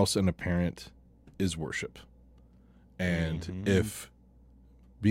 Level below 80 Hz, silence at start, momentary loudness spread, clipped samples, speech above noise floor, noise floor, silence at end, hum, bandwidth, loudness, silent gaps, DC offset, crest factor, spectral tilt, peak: -50 dBFS; 0 s; 15 LU; under 0.1%; 28 dB; -58 dBFS; 0 s; none; 16.5 kHz; -32 LUFS; none; under 0.1%; 20 dB; -5.5 dB/octave; -12 dBFS